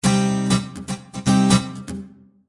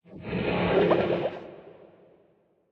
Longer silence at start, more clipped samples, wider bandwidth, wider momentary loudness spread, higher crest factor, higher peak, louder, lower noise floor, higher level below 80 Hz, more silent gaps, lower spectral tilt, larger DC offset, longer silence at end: about the same, 0.05 s vs 0.1 s; neither; first, 11.5 kHz vs 6 kHz; second, 17 LU vs 21 LU; about the same, 16 dB vs 18 dB; first, -4 dBFS vs -10 dBFS; first, -20 LUFS vs -26 LUFS; second, -40 dBFS vs -65 dBFS; first, -46 dBFS vs -52 dBFS; neither; second, -5 dB/octave vs -9 dB/octave; neither; second, 0.4 s vs 1 s